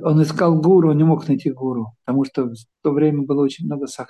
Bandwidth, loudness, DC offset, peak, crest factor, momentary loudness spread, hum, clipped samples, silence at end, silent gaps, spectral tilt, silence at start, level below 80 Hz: 11.5 kHz; -18 LUFS; under 0.1%; -4 dBFS; 14 dB; 12 LU; none; under 0.1%; 0.05 s; none; -8.5 dB/octave; 0 s; -64 dBFS